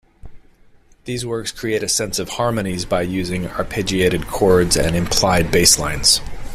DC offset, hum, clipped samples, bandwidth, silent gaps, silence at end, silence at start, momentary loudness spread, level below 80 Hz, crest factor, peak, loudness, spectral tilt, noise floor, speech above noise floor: under 0.1%; none; under 0.1%; 16 kHz; none; 0 s; 0.25 s; 11 LU; -34 dBFS; 18 dB; 0 dBFS; -17 LUFS; -3 dB/octave; -49 dBFS; 31 dB